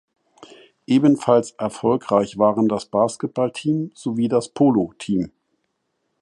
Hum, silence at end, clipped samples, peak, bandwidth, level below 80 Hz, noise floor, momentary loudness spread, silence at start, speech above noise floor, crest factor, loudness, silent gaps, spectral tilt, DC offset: none; 0.95 s; under 0.1%; -2 dBFS; 11.5 kHz; -60 dBFS; -73 dBFS; 7 LU; 0.9 s; 54 dB; 18 dB; -20 LUFS; none; -7 dB/octave; under 0.1%